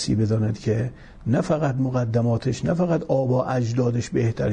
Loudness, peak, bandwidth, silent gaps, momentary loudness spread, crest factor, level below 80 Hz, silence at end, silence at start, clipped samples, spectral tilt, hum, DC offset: -23 LUFS; -8 dBFS; 9.4 kHz; none; 3 LU; 14 dB; -46 dBFS; 0 s; 0 s; under 0.1%; -7.5 dB/octave; none; under 0.1%